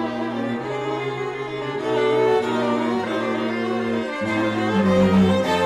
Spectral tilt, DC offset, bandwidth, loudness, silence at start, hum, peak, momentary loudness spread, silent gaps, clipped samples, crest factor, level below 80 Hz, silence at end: -6.5 dB/octave; under 0.1%; 12 kHz; -22 LUFS; 0 s; none; -8 dBFS; 9 LU; none; under 0.1%; 12 dB; -54 dBFS; 0 s